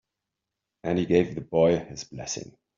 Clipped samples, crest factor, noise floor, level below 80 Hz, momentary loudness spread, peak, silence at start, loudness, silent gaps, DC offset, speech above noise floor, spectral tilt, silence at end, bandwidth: under 0.1%; 20 dB; -86 dBFS; -58 dBFS; 14 LU; -8 dBFS; 0.85 s; -26 LUFS; none; under 0.1%; 60 dB; -6 dB/octave; 0.35 s; 7.6 kHz